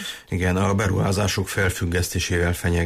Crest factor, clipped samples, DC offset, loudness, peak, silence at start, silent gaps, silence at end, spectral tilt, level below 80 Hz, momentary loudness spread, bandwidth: 12 dB; under 0.1%; under 0.1%; -22 LUFS; -10 dBFS; 0 s; none; 0 s; -5 dB/octave; -38 dBFS; 3 LU; 15.5 kHz